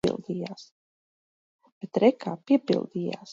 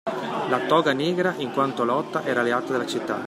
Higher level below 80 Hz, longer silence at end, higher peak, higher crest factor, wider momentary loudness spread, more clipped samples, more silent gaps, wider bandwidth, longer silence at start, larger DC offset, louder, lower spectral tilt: first, -64 dBFS vs -72 dBFS; about the same, 0 s vs 0 s; about the same, -6 dBFS vs -6 dBFS; about the same, 22 dB vs 18 dB; first, 16 LU vs 6 LU; neither; first, 0.71-1.59 s, 1.72-1.81 s vs none; second, 9.4 kHz vs 15.5 kHz; about the same, 0.05 s vs 0.05 s; neither; second, -27 LUFS vs -24 LUFS; first, -7 dB/octave vs -5.5 dB/octave